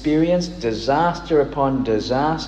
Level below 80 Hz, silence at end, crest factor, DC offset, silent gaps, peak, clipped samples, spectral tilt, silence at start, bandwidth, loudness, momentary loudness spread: -40 dBFS; 0 s; 14 dB; under 0.1%; none; -6 dBFS; under 0.1%; -6.5 dB/octave; 0 s; 8.6 kHz; -20 LUFS; 3 LU